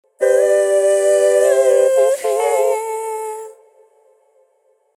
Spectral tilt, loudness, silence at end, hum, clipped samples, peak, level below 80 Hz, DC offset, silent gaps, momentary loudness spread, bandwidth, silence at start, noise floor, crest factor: 0 dB/octave; -15 LUFS; 1.45 s; none; under 0.1%; -2 dBFS; -78 dBFS; under 0.1%; none; 11 LU; 15.5 kHz; 0.2 s; -60 dBFS; 14 dB